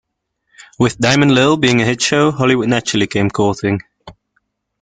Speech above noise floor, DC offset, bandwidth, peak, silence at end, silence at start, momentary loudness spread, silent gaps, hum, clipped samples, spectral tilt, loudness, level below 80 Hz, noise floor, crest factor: 55 dB; under 0.1%; 9.6 kHz; 0 dBFS; 0.7 s; 0.8 s; 7 LU; none; none; under 0.1%; -5 dB/octave; -14 LUFS; -48 dBFS; -69 dBFS; 16 dB